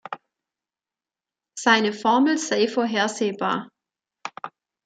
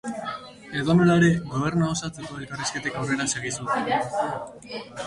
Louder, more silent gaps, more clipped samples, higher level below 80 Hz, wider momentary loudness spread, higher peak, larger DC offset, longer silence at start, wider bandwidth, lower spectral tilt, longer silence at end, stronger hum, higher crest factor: first, -22 LUFS vs -25 LUFS; neither; neither; second, -76 dBFS vs -52 dBFS; first, 20 LU vs 16 LU; first, -2 dBFS vs -8 dBFS; neither; about the same, 0.1 s vs 0.05 s; second, 9.4 kHz vs 11.5 kHz; second, -3.5 dB/octave vs -5 dB/octave; first, 0.4 s vs 0 s; neither; about the same, 22 dB vs 18 dB